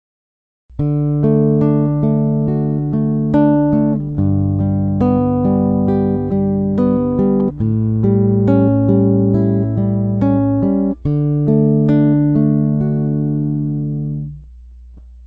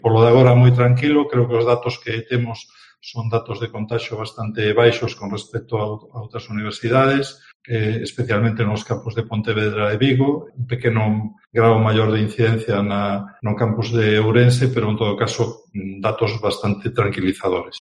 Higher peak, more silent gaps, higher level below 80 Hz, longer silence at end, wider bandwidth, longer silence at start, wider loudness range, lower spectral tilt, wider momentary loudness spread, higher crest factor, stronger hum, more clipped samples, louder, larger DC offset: about the same, 0 dBFS vs 0 dBFS; second, none vs 7.55-7.60 s; first, -36 dBFS vs -52 dBFS; second, 0 s vs 0.15 s; second, 3.8 kHz vs 11 kHz; first, 0.7 s vs 0.05 s; second, 1 LU vs 4 LU; first, -13 dB/octave vs -7 dB/octave; second, 5 LU vs 13 LU; about the same, 14 dB vs 18 dB; neither; neither; first, -15 LUFS vs -19 LUFS; neither